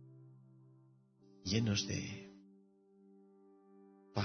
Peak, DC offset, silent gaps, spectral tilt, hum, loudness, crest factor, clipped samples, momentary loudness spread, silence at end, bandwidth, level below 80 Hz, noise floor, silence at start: -20 dBFS; under 0.1%; none; -5 dB/octave; none; -38 LUFS; 24 dB; under 0.1%; 28 LU; 0 s; 6.4 kHz; -70 dBFS; -67 dBFS; 0 s